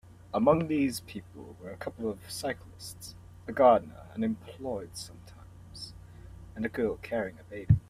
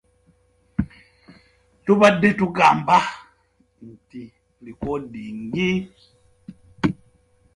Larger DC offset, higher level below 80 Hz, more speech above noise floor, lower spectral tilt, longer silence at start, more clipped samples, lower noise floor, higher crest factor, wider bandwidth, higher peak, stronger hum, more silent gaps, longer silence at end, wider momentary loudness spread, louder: neither; about the same, -54 dBFS vs -50 dBFS; second, 20 dB vs 43 dB; about the same, -6.5 dB/octave vs -6 dB/octave; second, 0.35 s vs 0.8 s; neither; second, -50 dBFS vs -63 dBFS; about the same, 22 dB vs 22 dB; first, 15.5 kHz vs 11.5 kHz; second, -10 dBFS vs -2 dBFS; neither; neither; second, 0.1 s vs 0.65 s; about the same, 23 LU vs 25 LU; second, -30 LUFS vs -20 LUFS